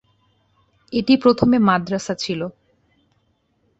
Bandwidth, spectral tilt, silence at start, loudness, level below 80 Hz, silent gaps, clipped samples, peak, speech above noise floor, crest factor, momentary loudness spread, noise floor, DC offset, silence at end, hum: 8.2 kHz; -6 dB/octave; 0.9 s; -18 LUFS; -52 dBFS; none; under 0.1%; -2 dBFS; 48 dB; 20 dB; 11 LU; -65 dBFS; under 0.1%; 1.3 s; none